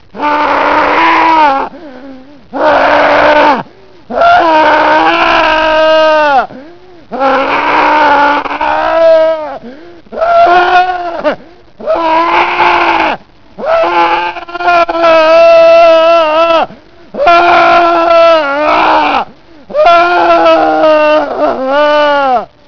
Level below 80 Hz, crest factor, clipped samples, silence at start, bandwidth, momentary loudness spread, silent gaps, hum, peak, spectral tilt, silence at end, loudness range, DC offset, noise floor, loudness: -40 dBFS; 8 dB; 3%; 0.15 s; 5.4 kHz; 10 LU; none; none; 0 dBFS; -4.5 dB/octave; 0.25 s; 4 LU; 2%; -34 dBFS; -7 LUFS